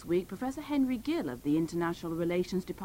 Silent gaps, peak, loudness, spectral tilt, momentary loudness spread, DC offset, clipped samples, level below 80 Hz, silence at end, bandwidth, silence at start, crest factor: none; -20 dBFS; -32 LUFS; -6.5 dB/octave; 4 LU; under 0.1%; under 0.1%; -56 dBFS; 0 s; 16 kHz; 0 s; 12 dB